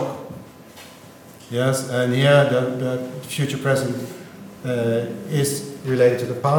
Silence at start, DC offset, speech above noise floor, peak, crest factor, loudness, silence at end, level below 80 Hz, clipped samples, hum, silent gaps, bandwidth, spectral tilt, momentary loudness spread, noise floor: 0 s; under 0.1%; 23 dB; -2 dBFS; 18 dB; -21 LUFS; 0 s; -64 dBFS; under 0.1%; none; none; 18 kHz; -5.5 dB/octave; 24 LU; -43 dBFS